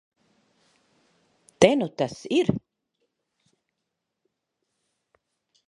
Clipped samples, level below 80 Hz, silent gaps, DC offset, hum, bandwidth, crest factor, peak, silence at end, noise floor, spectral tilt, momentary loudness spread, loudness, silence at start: under 0.1%; -62 dBFS; none; under 0.1%; none; 11.5 kHz; 28 dB; -2 dBFS; 3.1 s; -82 dBFS; -5 dB/octave; 10 LU; -23 LUFS; 1.6 s